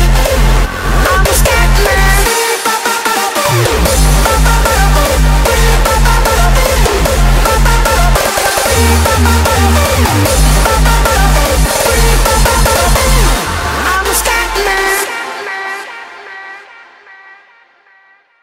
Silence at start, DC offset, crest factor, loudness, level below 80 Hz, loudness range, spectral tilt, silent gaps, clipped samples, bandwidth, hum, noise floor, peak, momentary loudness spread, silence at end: 0 s; under 0.1%; 10 dB; -10 LUFS; -12 dBFS; 5 LU; -3.5 dB/octave; none; under 0.1%; 16.5 kHz; none; -47 dBFS; 0 dBFS; 5 LU; 1.8 s